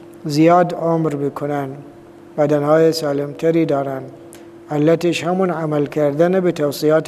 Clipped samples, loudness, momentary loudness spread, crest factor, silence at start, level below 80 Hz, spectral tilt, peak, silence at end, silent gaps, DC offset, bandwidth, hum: under 0.1%; -17 LUFS; 12 LU; 16 dB; 0 s; -62 dBFS; -6.5 dB/octave; 0 dBFS; 0 s; none; under 0.1%; 15 kHz; none